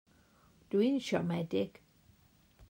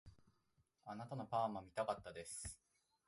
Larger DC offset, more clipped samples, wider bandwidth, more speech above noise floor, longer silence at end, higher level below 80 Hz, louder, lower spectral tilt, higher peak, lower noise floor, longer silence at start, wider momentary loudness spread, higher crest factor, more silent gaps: neither; neither; first, 16 kHz vs 12 kHz; about the same, 34 dB vs 36 dB; second, 0.05 s vs 0.5 s; about the same, -70 dBFS vs -70 dBFS; first, -34 LUFS vs -46 LUFS; first, -6.5 dB/octave vs -4.5 dB/octave; first, -18 dBFS vs -28 dBFS; second, -66 dBFS vs -81 dBFS; first, 0.7 s vs 0.05 s; second, 6 LU vs 13 LU; about the same, 18 dB vs 20 dB; neither